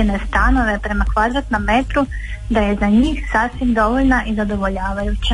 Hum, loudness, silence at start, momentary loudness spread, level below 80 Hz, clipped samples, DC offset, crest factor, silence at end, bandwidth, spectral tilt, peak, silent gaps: none; -17 LUFS; 0 s; 6 LU; -24 dBFS; under 0.1%; under 0.1%; 12 dB; 0 s; 11 kHz; -6.5 dB/octave; -4 dBFS; none